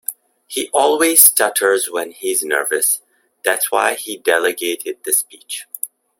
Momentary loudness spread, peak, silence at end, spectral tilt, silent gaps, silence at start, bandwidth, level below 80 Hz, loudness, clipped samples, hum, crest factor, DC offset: 17 LU; 0 dBFS; 0.35 s; 0.5 dB/octave; none; 0.1 s; 17 kHz; -68 dBFS; -15 LUFS; under 0.1%; none; 18 dB; under 0.1%